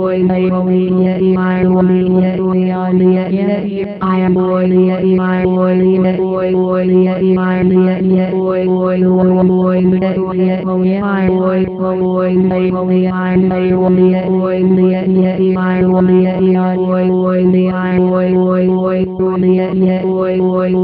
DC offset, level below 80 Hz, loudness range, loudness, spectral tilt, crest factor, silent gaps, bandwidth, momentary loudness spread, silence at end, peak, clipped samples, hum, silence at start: under 0.1%; -44 dBFS; 1 LU; -12 LUFS; -12.5 dB/octave; 10 dB; none; 4.7 kHz; 3 LU; 0 s; 0 dBFS; under 0.1%; none; 0 s